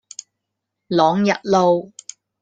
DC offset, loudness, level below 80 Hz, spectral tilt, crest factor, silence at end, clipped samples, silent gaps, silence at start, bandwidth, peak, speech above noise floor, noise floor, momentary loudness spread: under 0.1%; -18 LUFS; -62 dBFS; -5.5 dB/octave; 18 dB; 0.55 s; under 0.1%; none; 0.9 s; 9.4 kHz; -2 dBFS; 63 dB; -79 dBFS; 21 LU